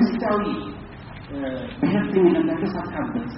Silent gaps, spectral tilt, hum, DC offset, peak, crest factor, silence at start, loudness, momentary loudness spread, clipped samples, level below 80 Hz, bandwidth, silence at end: none; -6.5 dB/octave; none; under 0.1%; -6 dBFS; 16 dB; 0 s; -23 LUFS; 17 LU; under 0.1%; -46 dBFS; 5.8 kHz; 0 s